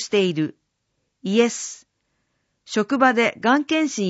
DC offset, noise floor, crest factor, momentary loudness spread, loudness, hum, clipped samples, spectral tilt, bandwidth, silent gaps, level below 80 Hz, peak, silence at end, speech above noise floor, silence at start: under 0.1%; -74 dBFS; 18 dB; 14 LU; -20 LUFS; none; under 0.1%; -4 dB/octave; 8 kHz; none; -70 dBFS; -4 dBFS; 0 s; 54 dB; 0 s